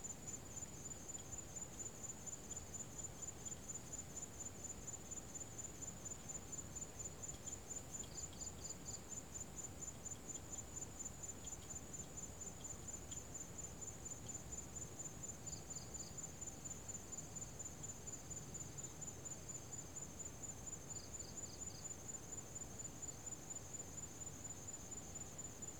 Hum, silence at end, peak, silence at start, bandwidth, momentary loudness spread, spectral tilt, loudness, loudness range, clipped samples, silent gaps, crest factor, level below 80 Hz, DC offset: none; 0 s; -36 dBFS; 0 s; over 20 kHz; 2 LU; -3 dB/octave; -49 LUFS; 1 LU; under 0.1%; none; 16 dB; -64 dBFS; under 0.1%